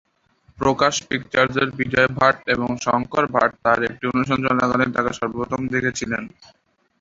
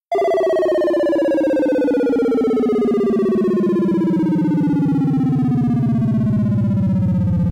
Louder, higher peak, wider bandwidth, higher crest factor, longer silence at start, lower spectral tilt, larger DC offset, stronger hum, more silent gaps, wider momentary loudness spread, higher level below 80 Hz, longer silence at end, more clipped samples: second, -20 LUFS vs -17 LUFS; first, -2 dBFS vs -10 dBFS; second, 7.8 kHz vs 11 kHz; first, 20 dB vs 6 dB; first, 0.6 s vs 0.1 s; second, -4.5 dB/octave vs -9.5 dB/octave; neither; neither; neither; first, 7 LU vs 1 LU; second, -50 dBFS vs -44 dBFS; first, 0.7 s vs 0 s; neither